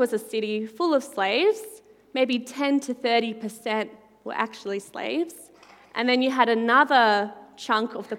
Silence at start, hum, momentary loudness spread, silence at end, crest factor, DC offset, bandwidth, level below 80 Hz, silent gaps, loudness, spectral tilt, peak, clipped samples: 0 s; none; 14 LU; 0 s; 22 dB; under 0.1%; 16.5 kHz; -76 dBFS; none; -24 LUFS; -3.5 dB/octave; -4 dBFS; under 0.1%